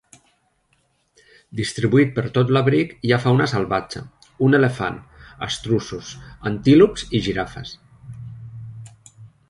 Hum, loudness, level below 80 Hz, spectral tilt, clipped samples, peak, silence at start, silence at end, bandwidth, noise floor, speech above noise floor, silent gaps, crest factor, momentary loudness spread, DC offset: none; -19 LUFS; -48 dBFS; -6.5 dB/octave; under 0.1%; -2 dBFS; 1.55 s; 0.25 s; 11.5 kHz; -65 dBFS; 46 dB; none; 20 dB; 21 LU; under 0.1%